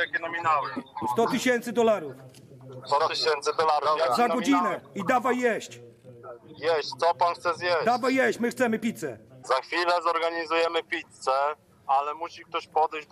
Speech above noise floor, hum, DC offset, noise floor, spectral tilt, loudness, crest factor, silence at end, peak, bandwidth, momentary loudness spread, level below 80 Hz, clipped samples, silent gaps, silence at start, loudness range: 19 dB; none; under 0.1%; -45 dBFS; -4 dB/octave; -26 LUFS; 16 dB; 0.1 s; -12 dBFS; 14.5 kHz; 11 LU; -76 dBFS; under 0.1%; none; 0 s; 2 LU